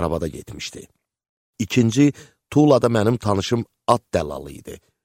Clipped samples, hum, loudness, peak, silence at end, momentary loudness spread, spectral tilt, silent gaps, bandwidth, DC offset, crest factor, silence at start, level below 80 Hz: under 0.1%; none; -20 LUFS; -2 dBFS; 0.3 s; 17 LU; -6.5 dB/octave; 1.29-1.53 s; 16 kHz; under 0.1%; 20 dB; 0 s; -46 dBFS